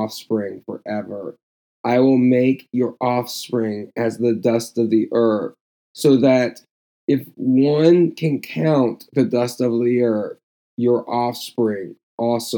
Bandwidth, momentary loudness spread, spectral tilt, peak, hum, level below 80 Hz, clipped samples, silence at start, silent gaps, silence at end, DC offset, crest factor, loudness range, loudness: 19 kHz; 13 LU; -6.5 dB/octave; -2 dBFS; none; -80 dBFS; under 0.1%; 0 s; 1.43-1.84 s, 5.61-5.94 s, 6.71-7.08 s, 10.43-10.78 s, 12.03-12.18 s; 0 s; under 0.1%; 18 dB; 3 LU; -19 LUFS